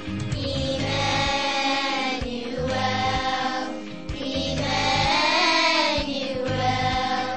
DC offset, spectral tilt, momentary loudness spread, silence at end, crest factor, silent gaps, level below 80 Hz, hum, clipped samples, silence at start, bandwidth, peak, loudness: 0.8%; -4 dB/octave; 10 LU; 0 s; 16 dB; none; -42 dBFS; none; under 0.1%; 0 s; 8.8 kHz; -8 dBFS; -23 LUFS